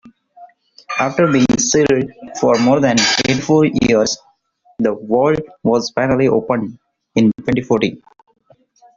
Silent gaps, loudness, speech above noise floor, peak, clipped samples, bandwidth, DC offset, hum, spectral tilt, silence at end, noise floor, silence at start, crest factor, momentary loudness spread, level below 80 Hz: none; -15 LUFS; 41 dB; -2 dBFS; under 0.1%; 7.8 kHz; under 0.1%; none; -4.5 dB/octave; 1 s; -55 dBFS; 0.05 s; 16 dB; 8 LU; -48 dBFS